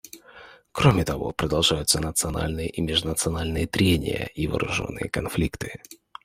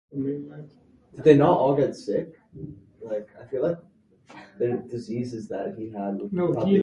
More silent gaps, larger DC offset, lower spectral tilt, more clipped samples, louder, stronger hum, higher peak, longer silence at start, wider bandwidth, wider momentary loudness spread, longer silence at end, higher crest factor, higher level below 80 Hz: neither; neither; second, -4 dB/octave vs -8.5 dB/octave; neither; about the same, -24 LUFS vs -25 LUFS; neither; about the same, -4 dBFS vs -4 dBFS; about the same, 0.05 s vs 0.15 s; first, 16 kHz vs 10 kHz; second, 15 LU vs 23 LU; first, 0.3 s vs 0 s; about the same, 20 dB vs 22 dB; first, -40 dBFS vs -60 dBFS